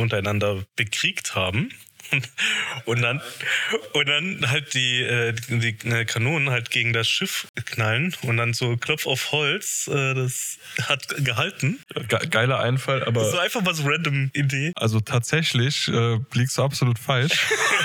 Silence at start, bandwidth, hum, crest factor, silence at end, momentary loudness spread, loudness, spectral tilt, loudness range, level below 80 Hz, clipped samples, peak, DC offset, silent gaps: 0 s; 19.5 kHz; none; 18 dB; 0 s; 5 LU; -22 LUFS; -4 dB/octave; 2 LU; -64 dBFS; under 0.1%; -6 dBFS; under 0.1%; 7.49-7.54 s